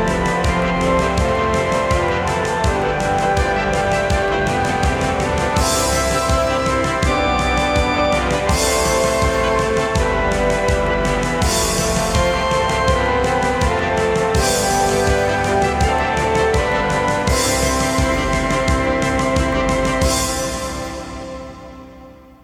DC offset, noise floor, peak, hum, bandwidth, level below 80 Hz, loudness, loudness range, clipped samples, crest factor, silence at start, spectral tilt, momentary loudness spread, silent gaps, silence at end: under 0.1%; -41 dBFS; -2 dBFS; none; 19 kHz; -26 dBFS; -17 LUFS; 1 LU; under 0.1%; 14 dB; 0 s; -4 dB/octave; 2 LU; none; 0.3 s